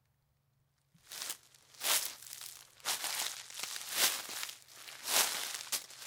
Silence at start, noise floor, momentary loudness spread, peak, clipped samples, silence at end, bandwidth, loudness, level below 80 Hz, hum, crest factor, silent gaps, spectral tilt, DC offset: 1.05 s; -76 dBFS; 16 LU; -10 dBFS; under 0.1%; 0 s; 18 kHz; -35 LUFS; -84 dBFS; none; 28 dB; none; 2 dB/octave; under 0.1%